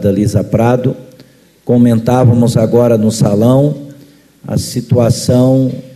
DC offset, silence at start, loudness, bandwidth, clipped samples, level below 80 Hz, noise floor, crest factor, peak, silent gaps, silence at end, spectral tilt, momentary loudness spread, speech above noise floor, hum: under 0.1%; 0 s; -11 LUFS; 13.5 kHz; under 0.1%; -42 dBFS; -43 dBFS; 12 dB; 0 dBFS; none; 0.05 s; -7.5 dB/octave; 9 LU; 33 dB; none